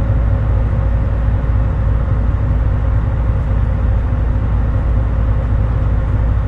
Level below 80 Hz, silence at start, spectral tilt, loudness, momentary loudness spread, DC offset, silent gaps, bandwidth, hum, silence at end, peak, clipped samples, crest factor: -16 dBFS; 0 s; -10 dB/octave; -17 LUFS; 1 LU; under 0.1%; none; 3.7 kHz; none; 0 s; -4 dBFS; under 0.1%; 10 dB